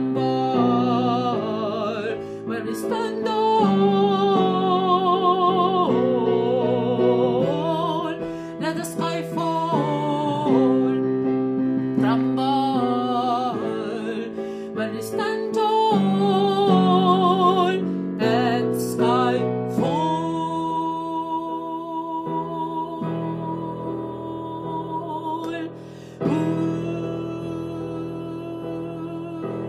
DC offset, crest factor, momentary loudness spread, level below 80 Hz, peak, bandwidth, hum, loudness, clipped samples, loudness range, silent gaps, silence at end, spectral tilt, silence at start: under 0.1%; 16 dB; 12 LU; -62 dBFS; -6 dBFS; 15 kHz; none; -22 LUFS; under 0.1%; 9 LU; none; 0 s; -7 dB/octave; 0 s